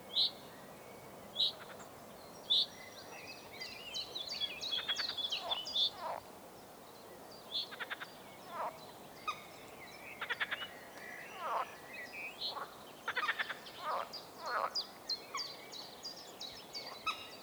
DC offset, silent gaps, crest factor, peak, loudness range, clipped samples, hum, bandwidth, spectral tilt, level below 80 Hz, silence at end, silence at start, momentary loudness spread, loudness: under 0.1%; none; 22 dB; -20 dBFS; 7 LU; under 0.1%; none; over 20 kHz; -1 dB/octave; -78 dBFS; 0 s; 0 s; 18 LU; -39 LUFS